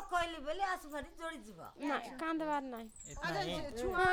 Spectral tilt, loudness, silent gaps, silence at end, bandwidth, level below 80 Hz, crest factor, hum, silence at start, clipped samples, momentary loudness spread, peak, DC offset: -4 dB/octave; -39 LUFS; none; 0 s; over 20 kHz; -56 dBFS; 18 dB; none; 0 s; under 0.1%; 10 LU; -20 dBFS; under 0.1%